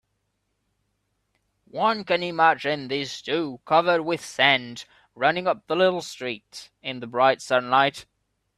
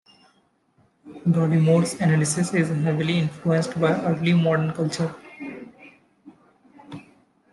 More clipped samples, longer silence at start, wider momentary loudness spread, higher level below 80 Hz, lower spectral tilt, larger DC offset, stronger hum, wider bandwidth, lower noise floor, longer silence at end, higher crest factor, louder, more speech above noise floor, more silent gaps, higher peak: neither; first, 1.75 s vs 1.05 s; second, 15 LU vs 18 LU; about the same, -68 dBFS vs -64 dBFS; second, -4 dB/octave vs -6 dB/octave; neither; neither; first, 13.5 kHz vs 12 kHz; first, -75 dBFS vs -64 dBFS; about the same, 0.55 s vs 0.5 s; first, 22 dB vs 16 dB; about the same, -23 LUFS vs -22 LUFS; first, 52 dB vs 43 dB; neither; first, -2 dBFS vs -8 dBFS